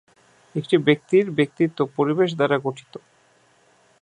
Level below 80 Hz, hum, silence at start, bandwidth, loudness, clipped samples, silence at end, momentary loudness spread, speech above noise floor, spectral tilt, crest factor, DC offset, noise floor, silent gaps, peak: -72 dBFS; none; 0.55 s; 10 kHz; -21 LUFS; under 0.1%; 1.05 s; 12 LU; 38 dB; -7 dB/octave; 20 dB; under 0.1%; -59 dBFS; none; -4 dBFS